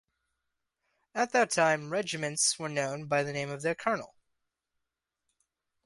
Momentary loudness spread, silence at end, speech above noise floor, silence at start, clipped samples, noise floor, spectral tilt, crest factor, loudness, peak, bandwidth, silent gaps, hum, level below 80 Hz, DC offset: 7 LU; 1.8 s; 56 dB; 1.15 s; under 0.1%; -86 dBFS; -3 dB/octave; 22 dB; -30 LUFS; -12 dBFS; 11.5 kHz; none; none; -76 dBFS; under 0.1%